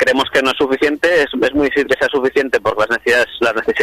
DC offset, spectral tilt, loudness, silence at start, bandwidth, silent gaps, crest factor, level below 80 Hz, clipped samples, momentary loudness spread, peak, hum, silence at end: under 0.1%; -3.5 dB/octave; -15 LUFS; 0 s; 14 kHz; none; 12 dB; -46 dBFS; under 0.1%; 3 LU; -2 dBFS; none; 0 s